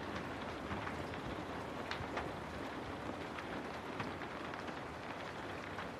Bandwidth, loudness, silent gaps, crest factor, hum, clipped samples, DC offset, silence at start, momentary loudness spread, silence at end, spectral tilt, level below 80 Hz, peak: 15 kHz; -44 LUFS; none; 20 dB; none; under 0.1%; under 0.1%; 0 s; 3 LU; 0 s; -5.5 dB/octave; -60 dBFS; -24 dBFS